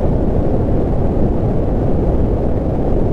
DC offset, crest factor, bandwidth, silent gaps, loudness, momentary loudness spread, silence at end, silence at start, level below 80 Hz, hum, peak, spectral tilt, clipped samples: under 0.1%; 12 dB; 4.1 kHz; none; -17 LUFS; 1 LU; 0 s; 0 s; -18 dBFS; none; -2 dBFS; -11 dB/octave; under 0.1%